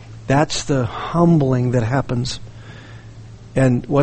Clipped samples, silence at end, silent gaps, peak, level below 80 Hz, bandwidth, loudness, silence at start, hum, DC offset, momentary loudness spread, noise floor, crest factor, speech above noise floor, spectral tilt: under 0.1%; 0 s; none; -2 dBFS; -40 dBFS; 8.8 kHz; -18 LUFS; 0 s; none; under 0.1%; 23 LU; -38 dBFS; 16 dB; 21 dB; -6.5 dB/octave